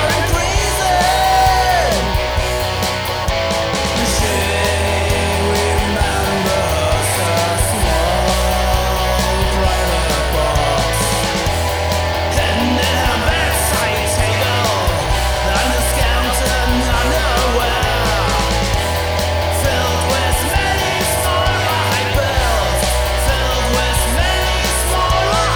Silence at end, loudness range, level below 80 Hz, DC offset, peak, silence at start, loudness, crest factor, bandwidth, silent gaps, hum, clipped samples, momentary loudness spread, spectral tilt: 0 s; 1 LU; -22 dBFS; under 0.1%; 0 dBFS; 0 s; -15 LUFS; 14 dB; over 20 kHz; none; none; under 0.1%; 2 LU; -3.5 dB/octave